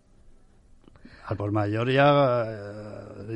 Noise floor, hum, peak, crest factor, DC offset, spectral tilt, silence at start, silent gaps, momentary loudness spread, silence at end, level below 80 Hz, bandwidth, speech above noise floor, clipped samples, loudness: -55 dBFS; none; -8 dBFS; 18 dB; under 0.1%; -8 dB/octave; 1.05 s; none; 21 LU; 0 s; -56 dBFS; 9.2 kHz; 31 dB; under 0.1%; -24 LUFS